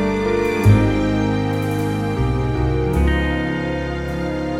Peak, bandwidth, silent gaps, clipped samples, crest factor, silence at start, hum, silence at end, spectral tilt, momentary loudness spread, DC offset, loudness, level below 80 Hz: -2 dBFS; 15.5 kHz; none; under 0.1%; 16 dB; 0 s; none; 0 s; -7.5 dB/octave; 8 LU; under 0.1%; -19 LUFS; -26 dBFS